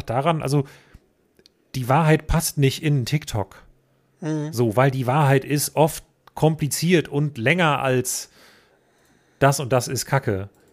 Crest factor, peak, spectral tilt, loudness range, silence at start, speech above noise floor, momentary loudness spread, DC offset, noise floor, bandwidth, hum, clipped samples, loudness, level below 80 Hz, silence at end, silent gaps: 18 dB; -4 dBFS; -5.5 dB/octave; 3 LU; 0.05 s; 41 dB; 11 LU; under 0.1%; -61 dBFS; 15.5 kHz; none; under 0.1%; -21 LUFS; -42 dBFS; 0.25 s; none